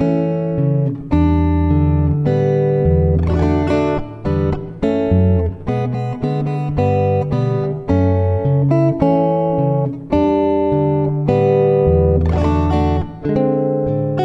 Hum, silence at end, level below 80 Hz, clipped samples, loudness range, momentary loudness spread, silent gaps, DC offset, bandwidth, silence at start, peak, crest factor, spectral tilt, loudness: none; 0 s; -24 dBFS; under 0.1%; 3 LU; 6 LU; none; under 0.1%; 7.4 kHz; 0 s; 0 dBFS; 14 dB; -10 dB/octave; -16 LUFS